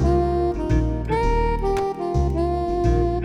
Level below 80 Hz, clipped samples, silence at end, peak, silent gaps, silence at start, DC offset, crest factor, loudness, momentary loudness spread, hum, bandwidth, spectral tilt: -26 dBFS; under 0.1%; 0 s; -8 dBFS; none; 0 s; under 0.1%; 12 dB; -22 LUFS; 3 LU; none; 11 kHz; -8.5 dB/octave